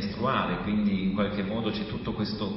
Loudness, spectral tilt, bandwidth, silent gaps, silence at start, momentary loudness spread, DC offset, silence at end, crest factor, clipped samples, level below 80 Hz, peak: -29 LUFS; -10.5 dB/octave; 5.8 kHz; none; 0 s; 5 LU; under 0.1%; 0 s; 16 dB; under 0.1%; -48 dBFS; -14 dBFS